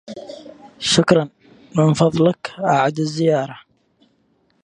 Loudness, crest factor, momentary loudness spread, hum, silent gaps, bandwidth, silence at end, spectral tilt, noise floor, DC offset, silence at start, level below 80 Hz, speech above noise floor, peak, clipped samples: -18 LUFS; 20 dB; 19 LU; none; none; 10.5 kHz; 1.05 s; -5.5 dB/octave; -62 dBFS; under 0.1%; 0.1 s; -56 dBFS; 45 dB; 0 dBFS; under 0.1%